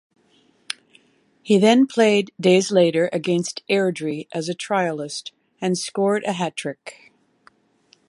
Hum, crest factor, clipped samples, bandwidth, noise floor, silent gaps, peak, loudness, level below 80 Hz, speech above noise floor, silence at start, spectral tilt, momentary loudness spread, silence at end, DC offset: none; 20 dB; under 0.1%; 11.5 kHz; -60 dBFS; none; -2 dBFS; -20 LUFS; -70 dBFS; 40 dB; 1.45 s; -5 dB/octave; 17 LU; 1.2 s; under 0.1%